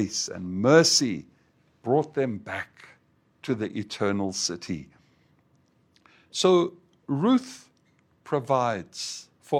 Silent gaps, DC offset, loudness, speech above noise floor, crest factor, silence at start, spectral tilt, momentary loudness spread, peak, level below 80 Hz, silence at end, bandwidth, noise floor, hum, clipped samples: none; under 0.1%; -25 LUFS; 40 dB; 24 dB; 0 s; -4 dB/octave; 17 LU; -4 dBFS; -68 dBFS; 0 s; 16 kHz; -65 dBFS; none; under 0.1%